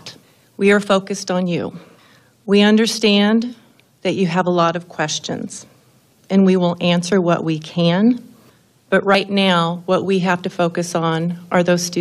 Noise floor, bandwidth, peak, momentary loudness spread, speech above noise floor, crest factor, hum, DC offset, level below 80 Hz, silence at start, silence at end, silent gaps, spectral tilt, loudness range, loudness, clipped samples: -53 dBFS; 13 kHz; -2 dBFS; 10 LU; 37 dB; 16 dB; none; under 0.1%; -64 dBFS; 0.05 s; 0 s; none; -5 dB/octave; 2 LU; -17 LUFS; under 0.1%